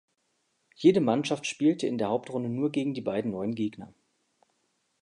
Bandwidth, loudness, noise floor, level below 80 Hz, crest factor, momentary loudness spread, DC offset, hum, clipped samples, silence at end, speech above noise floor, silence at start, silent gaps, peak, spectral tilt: 11 kHz; -28 LUFS; -75 dBFS; -70 dBFS; 20 dB; 9 LU; under 0.1%; none; under 0.1%; 1.15 s; 48 dB; 0.8 s; none; -8 dBFS; -6 dB/octave